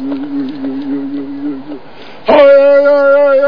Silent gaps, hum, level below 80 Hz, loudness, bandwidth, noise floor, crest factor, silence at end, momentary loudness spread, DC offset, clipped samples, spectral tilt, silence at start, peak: none; none; -52 dBFS; -10 LUFS; 5.4 kHz; -34 dBFS; 10 dB; 0 s; 17 LU; 3%; 0.4%; -7 dB/octave; 0 s; 0 dBFS